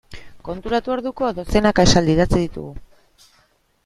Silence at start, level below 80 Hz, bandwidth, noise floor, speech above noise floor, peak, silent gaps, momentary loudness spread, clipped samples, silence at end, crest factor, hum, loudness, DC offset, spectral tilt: 0.1 s; -32 dBFS; 13 kHz; -60 dBFS; 42 dB; 0 dBFS; none; 19 LU; under 0.1%; 1 s; 20 dB; none; -18 LUFS; under 0.1%; -5 dB/octave